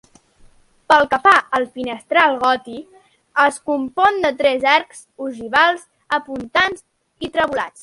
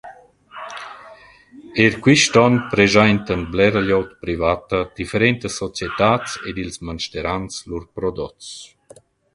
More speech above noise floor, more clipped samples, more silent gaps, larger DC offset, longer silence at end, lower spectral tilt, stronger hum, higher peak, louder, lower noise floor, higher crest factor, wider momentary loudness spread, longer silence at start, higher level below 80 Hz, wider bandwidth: about the same, 33 dB vs 30 dB; neither; neither; neither; second, 0.15 s vs 0.7 s; second, -3 dB/octave vs -4.5 dB/octave; neither; about the same, 0 dBFS vs 0 dBFS; about the same, -17 LUFS vs -18 LUFS; about the same, -50 dBFS vs -49 dBFS; about the same, 18 dB vs 20 dB; second, 16 LU vs 19 LU; first, 0.9 s vs 0.05 s; second, -56 dBFS vs -42 dBFS; about the same, 11.5 kHz vs 11.5 kHz